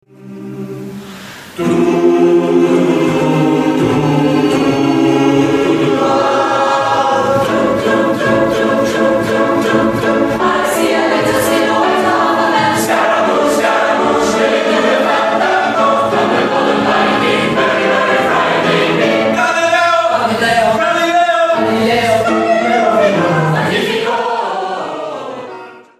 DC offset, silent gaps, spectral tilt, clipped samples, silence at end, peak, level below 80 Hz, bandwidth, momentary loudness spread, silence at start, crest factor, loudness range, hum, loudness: under 0.1%; none; -5 dB/octave; under 0.1%; 0.2 s; 0 dBFS; -48 dBFS; 15 kHz; 6 LU; 0.2 s; 12 dB; 1 LU; none; -12 LUFS